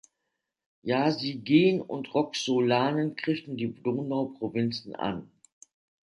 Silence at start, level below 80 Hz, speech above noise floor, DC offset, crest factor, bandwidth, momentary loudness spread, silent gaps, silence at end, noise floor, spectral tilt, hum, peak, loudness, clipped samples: 0.85 s; -68 dBFS; 56 dB; under 0.1%; 20 dB; 11.5 kHz; 10 LU; none; 0.85 s; -83 dBFS; -6 dB/octave; none; -10 dBFS; -28 LUFS; under 0.1%